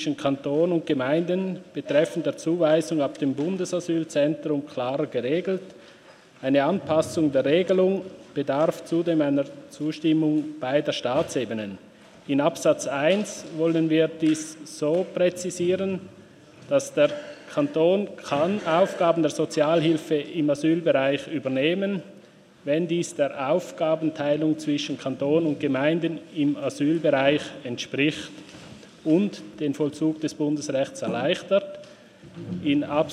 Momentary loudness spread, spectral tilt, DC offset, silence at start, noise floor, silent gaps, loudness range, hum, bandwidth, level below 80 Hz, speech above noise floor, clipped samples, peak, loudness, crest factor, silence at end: 10 LU; -5.5 dB/octave; under 0.1%; 0 s; -51 dBFS; none; 3 LU; none; 13 kHz; -70 dBFS; 27 dB; under 0.1%; -6 dBFS; -24 LUFS; 18 dB; 0 s